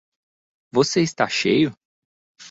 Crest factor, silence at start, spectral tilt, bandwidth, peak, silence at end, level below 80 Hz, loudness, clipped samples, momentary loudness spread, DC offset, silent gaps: 20 dB; 0.75 s; -4.5 dB/octave; 8 kHz; -4 dBFS; 0 s; -62 dBFS; -20 LUFS; under 0.1%; 5 LU; under 0.1%; 1.85-2.35 s